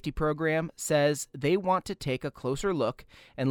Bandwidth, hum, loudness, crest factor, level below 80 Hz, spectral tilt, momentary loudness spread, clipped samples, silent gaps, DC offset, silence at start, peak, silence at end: 19 kHz; none; -29 LUFS; 14 dB; -48 dBFS; -5 dB/octave; 7 LU; under 0.1%; none; under 0.1%; 0.05 s; -14 dBFS; 0 s